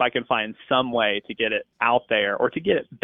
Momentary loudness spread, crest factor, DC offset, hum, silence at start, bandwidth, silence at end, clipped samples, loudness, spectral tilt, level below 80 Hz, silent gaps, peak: 4 LU; 16 dB; under 0.1%; none; 0 s; 3.9 kHz; 0.05 s; under 0.1%; -23 LUFS; -8 dB/octave; -60 dBFS; none; -6 dBFS